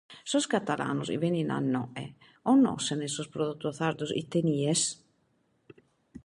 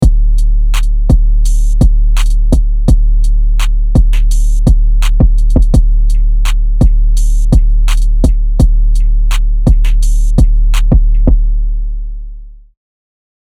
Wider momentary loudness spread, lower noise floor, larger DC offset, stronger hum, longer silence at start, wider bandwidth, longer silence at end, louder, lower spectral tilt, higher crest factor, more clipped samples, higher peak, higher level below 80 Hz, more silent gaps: first, 10 LU vs 3 LU; first, -71 dBFS vs -28 dBFS; neither; neither; about the same, 0.1 s vs 0 s; about the same, 11.5 kHz vs 11 kHz; second, 0.05 s vs 0.9 s; second, -29 LUFS vs -13 LUFS; second, -4.5 dB/octave vs -6.5 dB/octave; first, 18 dB vs 8 dB; second, under 0.1% vs 0.2%; second, -12 dBFS vs 0 dBFS; second, -68 dBFS vs -8 dBFS; neither